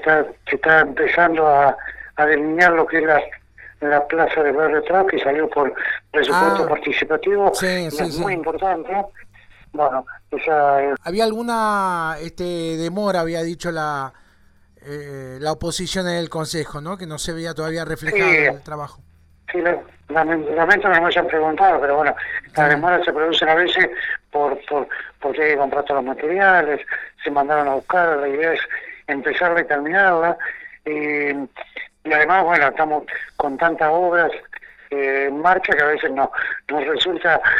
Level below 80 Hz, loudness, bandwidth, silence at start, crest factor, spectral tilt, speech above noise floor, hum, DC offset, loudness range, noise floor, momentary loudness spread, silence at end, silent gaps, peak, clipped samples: -50 dBFS; -18 LUFS; 15 kHz; 0 s; 18 dB; -4.5 dB/octave; 34 dB; none; under 0.1%; 7 LU; -53 dBFS; 13 LU; 0 s; none; -2 dBFS; under 0.1%